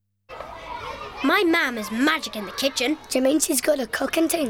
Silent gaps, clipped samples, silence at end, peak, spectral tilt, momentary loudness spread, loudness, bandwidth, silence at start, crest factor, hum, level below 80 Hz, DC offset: none; under 0.1%; 0 s; -6 dBFS; -2 dB/octave; 15 LU; -22 LUFS; 18.5 kHz; 0.3 s; 18 dB; none; -54 dBFS; under 0.1%